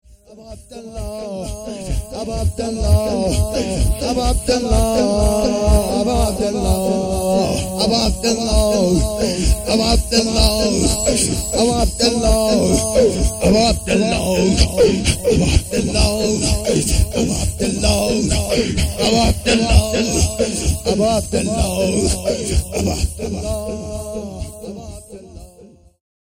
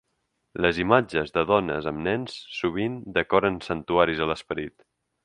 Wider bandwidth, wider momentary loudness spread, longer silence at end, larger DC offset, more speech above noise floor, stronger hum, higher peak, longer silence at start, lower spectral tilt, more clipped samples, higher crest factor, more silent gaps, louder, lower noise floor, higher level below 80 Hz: first, 17 kHz vs 10.5 kHz; about the same, 12 LU vs 11 LU; about the same, 0.55 s vs 0.55 s; neither; second, 28 dB vs 51 dB; neither; about the same, 0 dBFS vs -2 dBFS; second, 0.3 s vs 0.55 s; second, -4.5 dB/octave vs -6.5 dB/octave; neither; second, 16 dB vs 24 dB; neither; first, -17 LUFS vs -25 LUFS; second, -45 dBFS vs -76 dBFS; first, -24 dBFS vs -50 dBFS